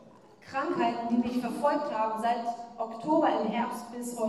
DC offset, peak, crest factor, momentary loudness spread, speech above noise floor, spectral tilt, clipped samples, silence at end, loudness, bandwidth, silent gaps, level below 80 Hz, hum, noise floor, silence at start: under 0.1%; -14 dBFS; 16 dB; 11 LU; 24 dB; -5 dB/octave; under 0.1%; 0 s; -30 LUFS; 13.5 kHz; none; -70 dBFS; none; -53 dBFS; 0 s